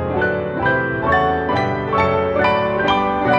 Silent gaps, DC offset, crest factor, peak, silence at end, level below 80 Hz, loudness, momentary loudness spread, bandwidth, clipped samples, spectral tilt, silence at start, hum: none; under 0.1%; 16 dB; -2 dBFS; 0 s; -40 dBFS; -18 LUFS; 3 LU; 8 kHz; under 0.1%; -7.5 dB/octave; 0 s; none